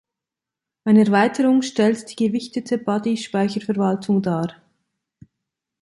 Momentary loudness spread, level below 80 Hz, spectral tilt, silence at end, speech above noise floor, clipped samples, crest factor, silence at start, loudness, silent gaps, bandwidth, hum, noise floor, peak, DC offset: 9 LU; -64 dBFS; -6.5 dB/octave; 1.3 s; 68 dB; under 0.1%; 16 dB; 0.85 s; -20 LUFS; none; 11.5 kHz; none; -87 dBFS; -4 dBFS; under 0.1%